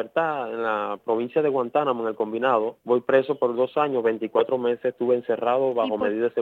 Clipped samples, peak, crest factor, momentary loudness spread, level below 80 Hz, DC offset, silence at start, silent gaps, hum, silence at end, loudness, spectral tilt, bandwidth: under 0.1%; -6 dBFS; 18 dB; 4 LU; -74 dBFS; under 0.1%; 0 s; none; none; 0 s; -24 LUFS; -7.5 dB/octave; 4.4 kHz